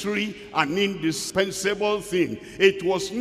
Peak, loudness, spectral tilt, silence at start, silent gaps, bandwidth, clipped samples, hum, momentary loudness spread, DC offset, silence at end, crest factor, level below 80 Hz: -6 dBFS; -24 LUFS; -4 dB/octave; 0 s; none; 15.5 kHz; under 0.1%; none; 6 LU; under 0.1%; 0 s; 20 dB; -56 dBFS